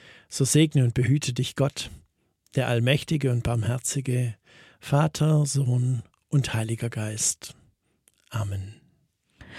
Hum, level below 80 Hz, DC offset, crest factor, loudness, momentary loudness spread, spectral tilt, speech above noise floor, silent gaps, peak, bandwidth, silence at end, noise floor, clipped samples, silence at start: none; -52 dBFS; under 0.1%; 20 dB; -25 LUFS; 14 LU; -5 dB/octave; 43 dB; none; -6 dBFS; 14.5 kHz; 0 s; -68 dBFS; under 0.1%; 0.3 s